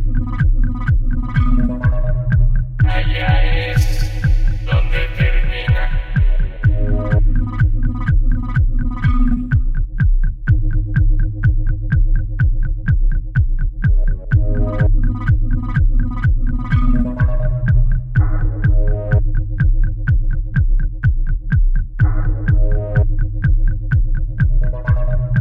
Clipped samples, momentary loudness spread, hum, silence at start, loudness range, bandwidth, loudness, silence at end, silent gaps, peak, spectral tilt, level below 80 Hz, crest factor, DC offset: under 0.1%; 3 LU; none; 0 s; 1 LU; 5.2 kHz; -18 LUFS; 0 s; none; -2 dBFS; -8 dB/octave; -16 dBFS; 12 dB; under 0.1%